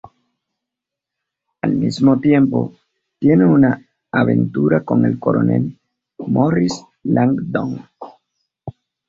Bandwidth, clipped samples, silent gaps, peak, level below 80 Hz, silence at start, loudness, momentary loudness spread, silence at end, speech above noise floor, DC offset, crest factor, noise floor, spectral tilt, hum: 7.8 kHz; under 0.1%; none; -2 dBFS; -52 dBFS; 1.65 s; -17 LUFS; 17 LU; 0.4 s; 69 dB; under 0.1%; 16 dB; -83 dBFS; -8 dB/octave; none